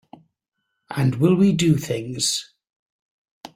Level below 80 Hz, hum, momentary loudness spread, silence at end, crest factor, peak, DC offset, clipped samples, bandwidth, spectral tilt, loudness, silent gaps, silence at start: -56 dBFS; none; 10 LU; 0.1 s; 18 dB; -4 dBFS; under 0.1%; under 0.1%; 16 kHz; -5.5 dB/octave; -20 LUFS; 2.76-3.25 s, 3.31-3.44 s; 0.9 s